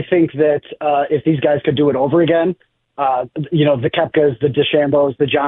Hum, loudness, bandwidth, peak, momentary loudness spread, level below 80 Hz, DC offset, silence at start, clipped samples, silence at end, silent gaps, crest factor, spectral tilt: none; -16 LUFS; 4 kHz; -2 dBFS; 5 LU; -54 dBFS; under 0.1%; 0 s; under 0.1%; 0 s; none; 12 dB; -11 dB/octave